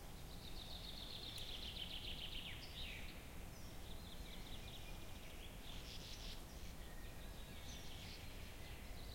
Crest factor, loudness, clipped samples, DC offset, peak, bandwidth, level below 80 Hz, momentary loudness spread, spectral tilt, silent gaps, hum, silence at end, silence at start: 16 dB; -52 LUFS; under 0.1%; under 0.1%; -36 dBFS; 16.5 kHz; -56 dBFS; 7 LU; -3.5 dB/octave; none; none; 0 s; 0 s